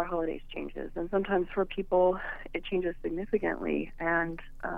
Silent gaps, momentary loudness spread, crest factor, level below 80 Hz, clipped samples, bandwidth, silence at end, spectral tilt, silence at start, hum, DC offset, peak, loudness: none; 12 LU; 16 dB; -46 dBFS; under 0.1%; 4 kHz; 0 s; -8 dB/octave; 0 s; none; under 0.1%; -14 dBFS; -31 LUFS